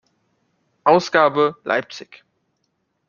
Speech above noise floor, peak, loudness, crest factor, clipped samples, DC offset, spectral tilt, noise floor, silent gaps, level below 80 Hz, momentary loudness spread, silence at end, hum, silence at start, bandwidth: 53 dB; -2 dBFS; -18 LUFS; 20 dB; under 0.1%; under 0.1%; -5 dB/octave; -71 dBFS; none; -64 dBFS; 16 LU; 1.05 s; none; 0.85 s; 7.2 kHz